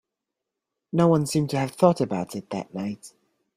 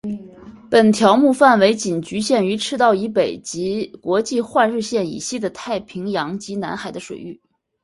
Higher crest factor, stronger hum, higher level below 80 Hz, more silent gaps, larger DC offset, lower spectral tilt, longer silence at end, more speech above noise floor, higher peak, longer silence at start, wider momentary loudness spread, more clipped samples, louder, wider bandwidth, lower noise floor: about the same, 22 dB vs 18 dB; neither; about the same, -62 dBFS vs -58 dBFS; neither; neither; first, -6.5 dB/octave vs -4.5 dB/octave; about the same, 0.5 s vs 0.5 s; first, 62 dB vs 22 dB; second, -4 dBFS vs 0 dBFS; first, 0.95 s vs 0.05 s; second, 12 LU vs 16 LU; neither; second, -24 LUFS vs -18 LUFS; first, 15.5 kHz vs 11.5 kHz; first, -85 dBFS vs -40 dBFS